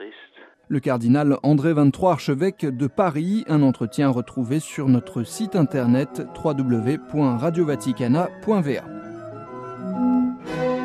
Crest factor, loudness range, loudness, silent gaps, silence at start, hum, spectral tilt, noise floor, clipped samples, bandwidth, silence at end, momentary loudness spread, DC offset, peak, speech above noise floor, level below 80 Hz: 16 dB; 3 LU; -22 LUFS; none; 0 s; none; -7.5 dB/octave; -49 dBFS; under 0.1%; 14 kHz; 0 s; 11 LU; under 0.1%; -6 dBFS; 28 dB; -58 dBFS